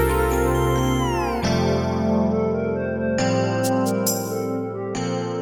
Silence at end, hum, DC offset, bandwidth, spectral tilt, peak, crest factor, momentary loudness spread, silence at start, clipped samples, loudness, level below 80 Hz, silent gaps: 0 s; none; under 0.1%; over 20 kHz; -5.5 dB/octave; -8 dBFS; 14 dB; 5 LU; 0 s; under 0.1%; -22 LUFS; -34 dBFS; none